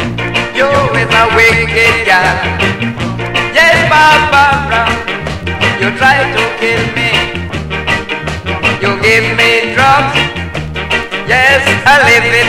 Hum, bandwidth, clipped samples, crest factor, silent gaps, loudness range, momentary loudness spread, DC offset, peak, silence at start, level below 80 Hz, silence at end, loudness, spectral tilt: none; 16.5 kHz; 0.2%; 10 dB; none; 4 LU; 11 LU; under 0.1%; 0 dBFS; 0 s; -30 dBFS; 0 s; -9 LUFS; -4 dB/octave